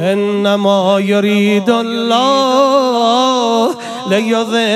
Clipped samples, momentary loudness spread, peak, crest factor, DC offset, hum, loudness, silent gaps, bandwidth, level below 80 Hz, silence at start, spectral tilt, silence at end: under 0.1%; 4 LU; 0 dBFS; 12 dB; under 0.1%; none; -12 LUFS; none; 13.5 kHz; -70 dBFS; 0 s; -5 dB/octave; 0 s